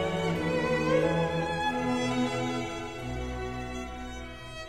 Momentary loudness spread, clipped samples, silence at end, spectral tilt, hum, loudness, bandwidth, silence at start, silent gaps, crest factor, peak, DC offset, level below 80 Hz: 13 LU; under 0.1%; 0 s; -5.5 dB/octave; none; -30 LUFS; 13.5 kHz; 0 s; none; 16 dB; -14 dBFS; 0.3%; -46 dBFS